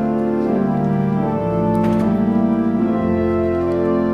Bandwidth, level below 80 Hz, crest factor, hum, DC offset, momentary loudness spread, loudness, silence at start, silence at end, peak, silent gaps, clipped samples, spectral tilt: 6 kHz; -40 dBFS; 12 dB; none; under 0.1%; 2 LU; -18 LUFS; 0 s; 0 s; -6 dBFS; none; under 0.1%; -10 dB/octave